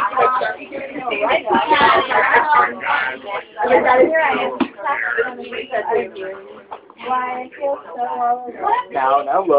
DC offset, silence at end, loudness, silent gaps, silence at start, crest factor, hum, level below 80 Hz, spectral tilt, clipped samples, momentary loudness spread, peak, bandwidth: under 0.1%; 0 s; -17 LUFS; none; 0 s; 18 dB; none; -58 dBFS; -8 dB/octave; under 0.1%; 15 LU; 0 dBFS; 5.2 kHz